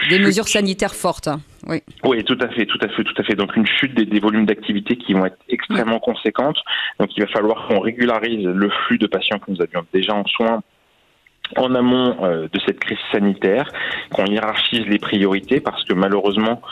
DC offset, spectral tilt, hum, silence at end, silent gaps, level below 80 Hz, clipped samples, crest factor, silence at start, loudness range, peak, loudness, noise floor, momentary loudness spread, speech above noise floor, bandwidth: under 0.1%; -4.5 dB/octave; none; 0 s; none; -54 dBFS; under 0.1%; 16 dB; 0 s; 2 LU; -2 dBFS; -18 LUFS; -58 dBFS; 5 LU; 40 dB; 13.5 kHz